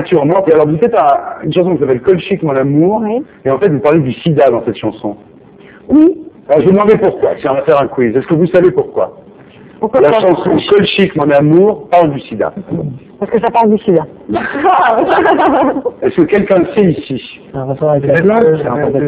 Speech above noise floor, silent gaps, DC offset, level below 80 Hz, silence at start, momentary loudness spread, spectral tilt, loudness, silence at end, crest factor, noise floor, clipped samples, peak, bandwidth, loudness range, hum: 27 dB; none; under 0.1%; -44 dBFS; 0 s; 10 LU; -11 dB/octave; -11 LUFS; 0 s; 10 dB; -38 dBFS; 0.6%; 0 dBFS; 4 kHz; 2 LU; none